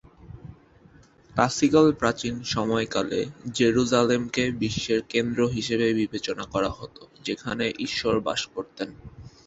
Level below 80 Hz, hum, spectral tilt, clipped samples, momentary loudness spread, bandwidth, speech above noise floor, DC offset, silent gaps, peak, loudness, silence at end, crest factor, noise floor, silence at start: -52 dBFS; none; -4.5 dB/octave; under 0.1%; 15 LU; 8.2 kHz; 29 dB; under 0.1%; none; -4 dBFS; -25 LUFS; 0.2 s; 22 dB; -54 dBFS; 0.2 s